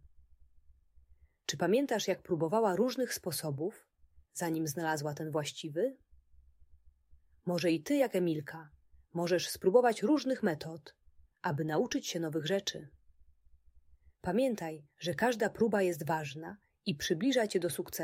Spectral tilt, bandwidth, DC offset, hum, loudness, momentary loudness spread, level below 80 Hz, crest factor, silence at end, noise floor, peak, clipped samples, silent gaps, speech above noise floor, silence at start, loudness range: -5 dB/octave; 16 kHz; under 0.1%; none; -33 LUFS; 12 LU; -68 dBFS; 22 dB; 0 s; -64 dBFS; -12 dBFS; under 0.1%; none; 31 dB; 1.5 s; 5 LU